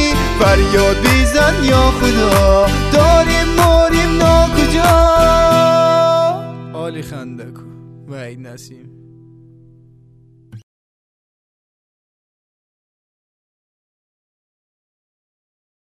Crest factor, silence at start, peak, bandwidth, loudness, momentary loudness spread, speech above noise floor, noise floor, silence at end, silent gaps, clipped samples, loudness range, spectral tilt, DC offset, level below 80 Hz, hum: 14 dB; 0 s; 0 dBFS; 14 kHz; -12 LUFS; 20 LU; 35 dB; -47 dBFS; 5.25 s; none; under 0.1%; 19 LU; -5 dB/octave; under 0.1%; -22 dBFS; none